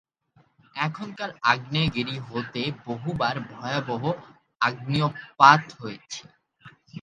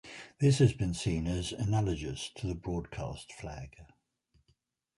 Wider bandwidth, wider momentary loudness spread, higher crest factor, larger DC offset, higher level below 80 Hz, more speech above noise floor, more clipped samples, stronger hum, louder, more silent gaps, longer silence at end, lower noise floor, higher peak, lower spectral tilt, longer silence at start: second, 9.2 kHz vs 11.5 kHz; first, 20 LU vs 17 LU; first, 26 dB vs 20 dB; neither; second, -56 dBFS vs -48 dBFS; second, 38 dB vs 43 dB; neither; neither; first, -24 LUFS vs -32 LUFS; neither; second, 0 s vs 1.15 s; second, -63 dBFS vs -74 dBFS; first, 0 dBFS vs -12 dBFS; about the same, -5 dB/octave vs -6 dB/octave; first, 0.75 s vs 0.05 s